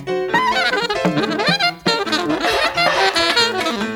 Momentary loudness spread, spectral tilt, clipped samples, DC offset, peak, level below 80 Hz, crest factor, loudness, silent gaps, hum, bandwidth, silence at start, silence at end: 4 LU; -3.5 dB/octave; under 0.1%; under 0.1%; -2 dBFS; -48 dBFS; 16 dB; -16 LUFS; none; none; over 20 kHz; 0 s; 0 s